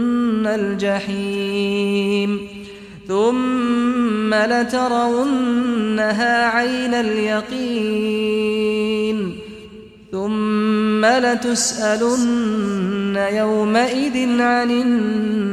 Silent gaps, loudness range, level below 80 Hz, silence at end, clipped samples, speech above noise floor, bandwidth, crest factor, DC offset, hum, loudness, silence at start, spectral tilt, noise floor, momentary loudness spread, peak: none; 3 LU; -54 dBFS; 0 s; under 0.1%; 22 dB; 13 kHz; 14 dB; under 0.1%; none; -18 LUFS; 0 s; -4.5 dB/octave; -40 dBFS; 7 LU; -4 dBFS